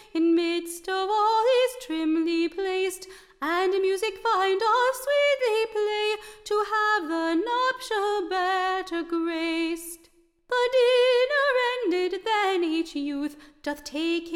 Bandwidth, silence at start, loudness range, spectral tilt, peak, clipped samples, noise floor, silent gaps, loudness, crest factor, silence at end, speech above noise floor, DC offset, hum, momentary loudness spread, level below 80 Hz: 16 kHz; 0.15 s; 2 LU; -1.5 dB/octave; -12 dBFS; under 0.1%; -60 dBFS; none; -25 LUFS; 12 dB; 0 s; 31 dB; under 0.1%; none; 9 LU; -62 dBFS